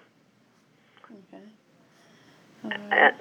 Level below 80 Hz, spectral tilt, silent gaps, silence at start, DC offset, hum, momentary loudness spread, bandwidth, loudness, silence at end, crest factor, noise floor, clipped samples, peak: under -90 dBFS; -4.5 dB/octave; none; 2.65 s; under 0.1%; none; 30 LU; 8.8 kHz; -23 LUFS; 0.05 s; 24 dB; -63 dBFS; under 0.1%; -6 dBFS